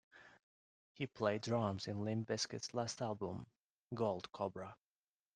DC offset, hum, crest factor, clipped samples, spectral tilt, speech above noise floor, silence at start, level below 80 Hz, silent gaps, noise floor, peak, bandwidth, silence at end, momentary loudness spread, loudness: under 0.1%; none; 22 dB; under 0.1%; -5 dB/octave; over 49 dB; 0.15 s; -78 dBFS; 0.43-0.95 s, 3.64-3.86 s; under -90 dBFS; -22 dBFS; 10 kHz; 0.6 s; 12 LU; -42 LUFS